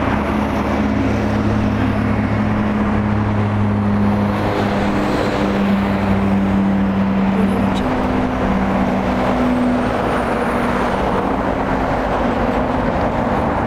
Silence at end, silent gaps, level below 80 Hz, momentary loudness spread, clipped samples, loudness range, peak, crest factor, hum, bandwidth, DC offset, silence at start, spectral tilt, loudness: 0 s; none; -30 dBFS; 2 LU; under 0.1%; 1 LU; -4 dBFS; 14 dB; none; 11.5 kHz; under 0.1%; 0 s; -7.5 dB/octave; -17 LUFS